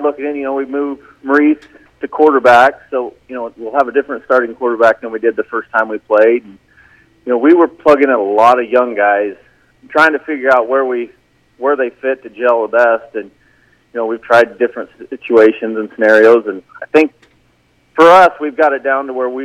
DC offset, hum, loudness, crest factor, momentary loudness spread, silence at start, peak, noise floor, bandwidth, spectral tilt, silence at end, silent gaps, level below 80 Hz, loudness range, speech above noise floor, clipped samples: under 0.1%; none; -12 LUFS; 12 dB; 15 LU; 0 s; 0 dBFS; -55 dBFS; 11 kHz; -5 dB/octave; 0 s; none; -56 dBFS; 4 LU; 43 dB; 0.4%